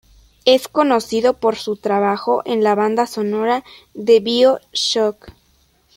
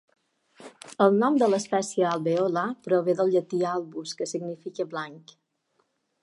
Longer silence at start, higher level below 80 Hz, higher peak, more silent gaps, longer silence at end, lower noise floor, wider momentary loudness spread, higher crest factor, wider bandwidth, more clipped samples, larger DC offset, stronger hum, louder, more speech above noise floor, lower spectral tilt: second, 0.45 s vs 0.6 s; first, -56 dBFS vs -80 dBFS; first, 0 dBFS vs -6 dBFS; neither; second, 0.65 s vs 1.05 s; second, -58 dBFS vs -73 dBFS; second, 6 LU vs 14 LU; about the same, 18 dB vs 20 dB; first, 16.5 kHz vs 11.5 kHz; neither; neither; neither; first, -17 LUFS vs -26 LUFS; second, 41 dB vs 47 dB; second, -4 dB/octave vs -5.5 dB/octave